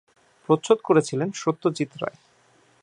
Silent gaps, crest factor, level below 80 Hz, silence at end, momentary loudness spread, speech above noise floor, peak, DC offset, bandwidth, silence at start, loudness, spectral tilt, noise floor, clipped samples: none; 22 dB; -74 dBFS; 0.75 s; 14 LU; 37 dB; -4 dBFS; under 0.1%; 10.5 kHz; 0.5 s; -24 LUFS; -6 dB/octave; -60 dBFS; under 0.1%